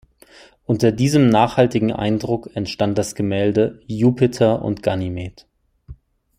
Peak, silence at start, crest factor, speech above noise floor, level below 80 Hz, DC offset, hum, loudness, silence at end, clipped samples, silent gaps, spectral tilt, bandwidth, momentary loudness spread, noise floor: -2 dBFS; 0.7 s; 18 dB; 30 dB; -48 dBFS; under 0.1%; none; -19 LUFS; 0.45 s; under 0.1%; none; -6.5 dB/octave; 15.5 kHz; 10 LU; -48 dBFS